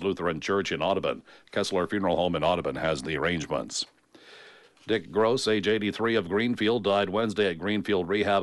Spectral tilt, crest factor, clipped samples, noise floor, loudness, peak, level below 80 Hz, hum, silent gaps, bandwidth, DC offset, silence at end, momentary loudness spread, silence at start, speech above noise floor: -4.5 dB/octave; 14 dB; under 0.1%; -53 dBFS; -27 LUFS; -12 dBFS; -56 dBFS; none; none; 11.5 kHz; under 0.1%; 0 s; 6 LU; 0 s; 26 dB